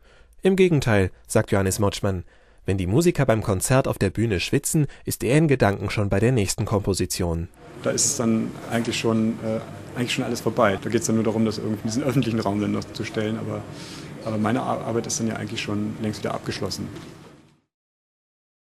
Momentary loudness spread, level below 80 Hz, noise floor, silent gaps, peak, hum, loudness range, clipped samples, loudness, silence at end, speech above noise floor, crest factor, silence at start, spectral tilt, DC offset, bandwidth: 10 LU; -46 dBFS; -51 dBFS; none; -4 dBFS; none; 5 LU; under 0.1%; -23 LUFS; 1.45 s; 28 dB; 20 dB; 0.4 s; -5 dB/octave; under 0.1%; 14 kHz